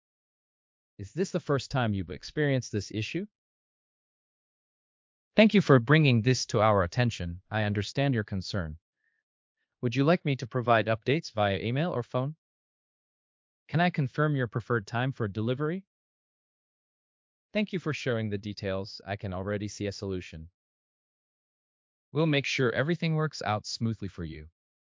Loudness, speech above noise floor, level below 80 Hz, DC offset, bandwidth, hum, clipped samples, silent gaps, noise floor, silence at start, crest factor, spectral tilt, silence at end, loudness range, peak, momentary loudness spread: -29 LUFS; over 62 dB; -54 dBFS; under 0.1%; 7.6 kHz; none; under 0.1%; 3.31-5.31 s, 8.81-8.93 s, 9.23-9.55 s, 12.38-13.66 s, 15.87-17.49 s, 20.54-22.12 s; under -90 dBFS; 1 s; 24 dB; -6 dB/octave; 0.45 s; 10 LU; -6 dBFS; 13 LU